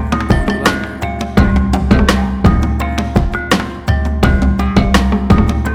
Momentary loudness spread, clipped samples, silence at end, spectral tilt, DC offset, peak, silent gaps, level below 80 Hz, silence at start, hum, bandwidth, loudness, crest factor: 5 LU; under 0.1%; 0 s; -6.5 dB/octave; under 0.1%; 0 dBFS; none; -18 dBFS; 0 s; none; 15.5 kHz; -14 LUFS; 12 dB